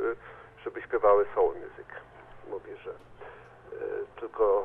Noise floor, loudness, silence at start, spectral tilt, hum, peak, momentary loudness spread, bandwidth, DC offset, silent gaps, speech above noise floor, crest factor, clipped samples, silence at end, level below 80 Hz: -49 dBFS; -29 LUFS; 0 s; -8 dB/octave; none; -10 dBFS; 25 LU; 3.8 kHz; under 0.1%; none; 21 dB; 20 dB; under 0.1%; 0 s; -60 dBFS